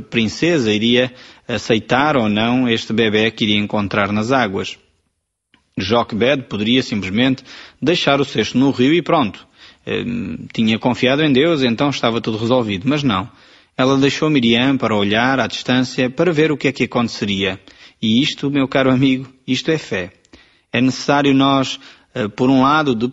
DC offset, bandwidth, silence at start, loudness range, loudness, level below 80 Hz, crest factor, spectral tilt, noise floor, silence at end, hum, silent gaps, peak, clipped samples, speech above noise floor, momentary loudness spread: under 0.1%; 8 kHz; 0 s; 2 LU; -17 LUFS; -50 dBFS; 16 dB; -5.5 dB/octave; -71 dBFS; 0 s; none; none; -2 dBFS; under 0.1%; 55 dB; 10 LU